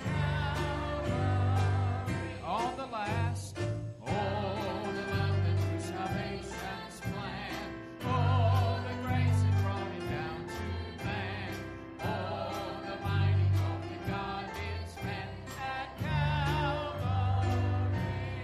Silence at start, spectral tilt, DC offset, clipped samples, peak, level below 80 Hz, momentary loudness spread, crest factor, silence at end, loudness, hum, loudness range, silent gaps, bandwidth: 0 s; -6.5 dB/octave; under 0.1%; under 0.1%; -18 dBFS; -48 dBFS; 10 LU; 14 dB; 0 s; -33 LUFS; none; 4 LU; none; 13 kHz